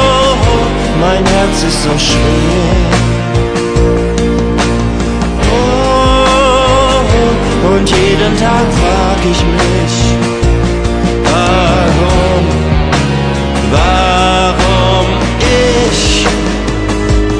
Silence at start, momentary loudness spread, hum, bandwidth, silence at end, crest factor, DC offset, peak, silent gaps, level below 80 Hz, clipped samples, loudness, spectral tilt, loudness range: 0 s; 4 LU; none; 10 kHz; 0 s; 10 dB; 0.4%; 0 dBFS; none; -16 dBFS; under 0.1%; -10 LUFS; -5 dB/octave; 2 LU